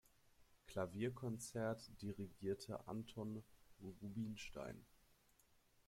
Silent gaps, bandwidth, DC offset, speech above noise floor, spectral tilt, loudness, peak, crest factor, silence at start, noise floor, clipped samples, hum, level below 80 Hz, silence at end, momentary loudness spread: none; 16.5 kHz; under 0.1%; 27 dB; -6 dB/octave; -49 LUFS; -30 dBFS; 20 dB; 0.4 s; -75 dBFS; under 0.1%; none; -72 dBFS; 0.75 s; 10 LU